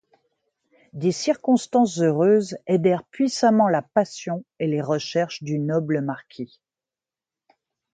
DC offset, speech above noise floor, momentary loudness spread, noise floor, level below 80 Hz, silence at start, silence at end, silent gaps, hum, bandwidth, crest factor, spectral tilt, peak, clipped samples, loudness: under 0.1%; over 68 dB; 12 LU; under -90 dBFS; -70 dBFS; 0.95 s; 1.5 s; none; none; 9.4 kHz; 18 dB; -6 dB/octave; -6 dBFS; under 0.1%; -22 LUFS